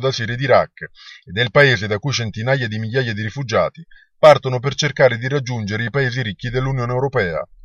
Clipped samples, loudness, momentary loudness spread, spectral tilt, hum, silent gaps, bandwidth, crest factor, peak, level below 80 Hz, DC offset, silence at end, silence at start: under 0.1%; -18 LUFS; 10 LU; -5.5 dB/octave; none; none; 8.4 kHz; 18 dB; 0 dBFS; -46 dBFS; under 0.1%; 0.2 s; 0 s